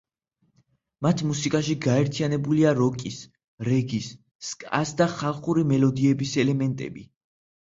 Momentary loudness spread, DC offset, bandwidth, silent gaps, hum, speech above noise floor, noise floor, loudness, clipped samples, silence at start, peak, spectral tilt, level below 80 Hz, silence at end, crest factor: 14 LU; under 0.1%; 7.8 kHz; 3.44-3.58 s, 4.31-4.39 s; none; 48 dB; -72 dBFS; -24 LUFS; under 0.1%; 1 s; -6 dBFS; -6 dB/octave; -60 dBFS; 0.6 s; 18 dB